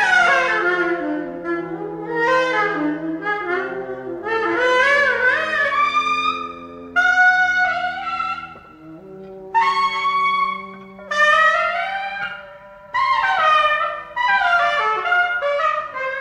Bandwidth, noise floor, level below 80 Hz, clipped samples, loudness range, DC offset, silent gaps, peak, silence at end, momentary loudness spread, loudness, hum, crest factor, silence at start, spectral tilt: 10.5 kHz; -40 dBFS; -56 dBFS; under 0.1%; 4 LU; under 0.1%; none; -4 dBFS; 0 s; 14 LU; -18 LUFS; none; 14 dB; 0 s; -3 dB/octave